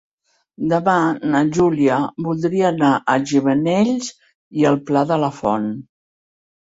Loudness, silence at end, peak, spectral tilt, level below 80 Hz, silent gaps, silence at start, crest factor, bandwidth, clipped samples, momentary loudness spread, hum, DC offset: -18 LUFS; 0.85 s; -2 dBFS; -6.5 dB/octave; -56 dBFS; 4.35-4.51 s; 0.6 s; 16 dB; 8 kHz; under 0.1%; 8 LU; none; under 0.1%